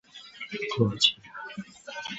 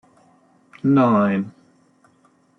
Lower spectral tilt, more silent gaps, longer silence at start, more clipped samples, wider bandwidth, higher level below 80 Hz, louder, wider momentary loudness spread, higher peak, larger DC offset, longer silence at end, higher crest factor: second, -4 dB/octave vs -9.5 dB/octave; neither; second, 0.15 s vs 0.85 s; neither; first, 8 kHz vs 6.2 kHz; first, -62 dBFS vs -68 dBFS; second, -26 LUFS vs -18 LUFS; first, 19 LU vs 11 LU; about the same, -8 dBFS vs -6 dBFS; neither; second, 0 s vs 1.1 s; first, 24 dB vs 16 dB